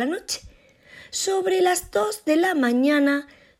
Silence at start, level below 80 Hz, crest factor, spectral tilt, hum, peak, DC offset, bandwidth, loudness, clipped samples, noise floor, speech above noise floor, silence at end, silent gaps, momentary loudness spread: 0 s; -56 dBFS; 16 dB; -2.5 dB/octave; none; -8 dBFS; under 0.1%; 16 kHz; -22 LUFS; under 0.1%; -50 dBFS; 29 dB; 0.35 s; none; 10 LU